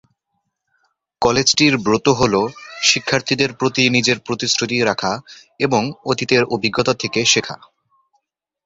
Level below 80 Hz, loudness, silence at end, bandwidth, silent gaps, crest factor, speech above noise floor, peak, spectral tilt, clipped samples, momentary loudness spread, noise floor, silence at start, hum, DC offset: -50 dBFS; -17 LUFS; 1.1 s; 8 kHz; none; 18 dB; 56 dB; 0 dBFS; -3 dB/octave; under 0.1%; 8 LU; -73 dBFS; 1.2 s; none; under 0.1%